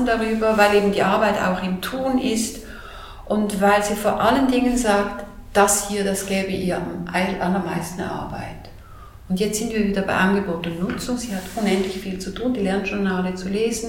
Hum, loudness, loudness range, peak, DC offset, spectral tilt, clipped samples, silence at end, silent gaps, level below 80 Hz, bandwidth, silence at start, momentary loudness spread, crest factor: none; -21 LUFS; 5 LU; -2 dBFS; under 0.1%; -4.5 dB/octave; under 0.1%; 0 s; none; -42 dBFS; 17 kHz; 0 s; 11 LU; 20 dB